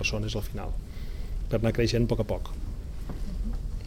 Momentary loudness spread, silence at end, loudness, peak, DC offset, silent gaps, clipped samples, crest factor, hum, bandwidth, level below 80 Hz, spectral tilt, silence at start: 14 LU; 0 s; -31 LUFS; -12 dBFS; 0.3%; none; under 0.1%; 16 dB; none; 16 kHz; -34 dBFS; -6 dB/octave; 0 s